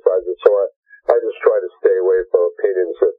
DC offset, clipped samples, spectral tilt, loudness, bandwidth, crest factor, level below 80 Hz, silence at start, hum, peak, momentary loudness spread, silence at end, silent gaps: under 0.1%; under 0.1%; -6 dB/octave; -17 LUFS; 3.9 kHz; 16 dB; -58 dBFS; 0.05 s; none; 0 dBFS; 4 LU; 0.05 s; 0.76-0.83 s